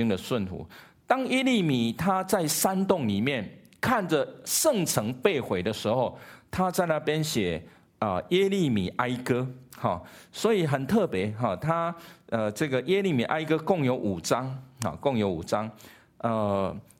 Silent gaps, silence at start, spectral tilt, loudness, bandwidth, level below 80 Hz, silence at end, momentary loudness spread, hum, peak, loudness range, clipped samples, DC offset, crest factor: none; 0 s; -5 dB/octave; -27 LUFS; 16.5 kHz; -58 dBFS; 0.2 s; 9 LU; none; -6 dBFS; 2 LU; under 0.1%; under 0.1%; 22 dB